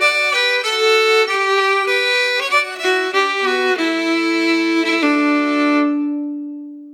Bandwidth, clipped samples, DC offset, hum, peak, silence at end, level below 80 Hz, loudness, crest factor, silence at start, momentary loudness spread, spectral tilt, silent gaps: 17 kHz; under 0.1%; under 0.1%; none; -2 dBFS; 0 s; under -90 dBFS; -15 LUFS; 14 dB; 0 s; 6 LU; -1 dB/octave; none